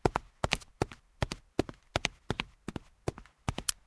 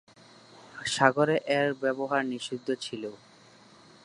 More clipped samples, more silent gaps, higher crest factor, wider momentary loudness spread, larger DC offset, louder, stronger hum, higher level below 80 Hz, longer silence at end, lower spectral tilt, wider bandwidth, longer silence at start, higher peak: neither; neither; about the same, 30 dB vs 26 dB; second, 8 LU vs 14 LU; neither; second, -37 LUFS vs -28 LUFS; neither; first, -48 dBFS vs -74 dBFS; second, 0.15 s vs 0.9 s; about the same, -4 dB/octave vs -4.5 dB/octave; about the same, 11 kHz vs 11.5 kHz; second, 0.05 s vs 0.55 s; about the same, -6 dBFS vs -4 dBFS